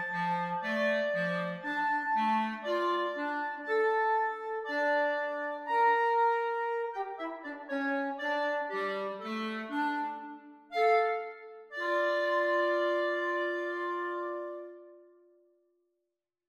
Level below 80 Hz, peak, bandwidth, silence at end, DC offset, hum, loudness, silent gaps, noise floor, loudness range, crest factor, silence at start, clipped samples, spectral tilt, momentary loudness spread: -86 dBFS; -16 dBFS; 12 kHz; 1.45 s; under 0.1%; none; -31 LUFS; none; -86 dBFS; 4 LU; 16 dB; 0 s; under 0.1%; -5.5 dB/octave; 11 LU